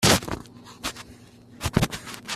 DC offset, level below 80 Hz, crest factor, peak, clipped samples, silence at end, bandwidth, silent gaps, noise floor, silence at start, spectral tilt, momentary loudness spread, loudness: under 0.1%; -44 dBFS; 24 dB; -4 dBFS; under 0.1%; 0 s; 15.5 kHz; none; -48 dBFS; 0 s; -3.5 dB/octave; 21 LU; -27 LUFS